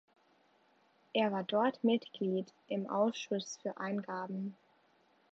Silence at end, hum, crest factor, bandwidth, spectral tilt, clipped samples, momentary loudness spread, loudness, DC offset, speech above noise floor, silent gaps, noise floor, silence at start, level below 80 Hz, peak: 0.8 s; none; 20 dB; 7.6 kHz; -4.5 dB/octave; under 0.1%; 9 LU; -36 LUFS; under 0.1%; 35 dB; none; -70 dBFS; 1.15 s; -90 dBFS; -18 dBFS